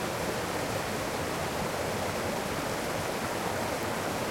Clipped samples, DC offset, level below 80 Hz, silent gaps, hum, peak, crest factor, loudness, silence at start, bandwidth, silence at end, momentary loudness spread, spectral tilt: under 0.1%; under 0.1%; -52 dBFS; none; none; -18 dBFS; 14 dB; -32 LUFS; 0 s; 16.5 kHz; 0 s; 0 LU; -4 dB/octave